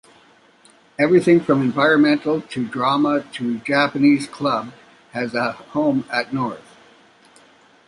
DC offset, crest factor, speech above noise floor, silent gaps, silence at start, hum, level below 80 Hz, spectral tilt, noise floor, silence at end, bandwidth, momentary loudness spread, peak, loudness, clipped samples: under 0.1%; 16 dB; 34 dB; none; 1 s; none; -64 dBFS; -6 dB/octave; -53 dBFS; 1.3 s; 11.5 kHz; 12 LU; -4 dBFS; -19 LUFS; under 0.1%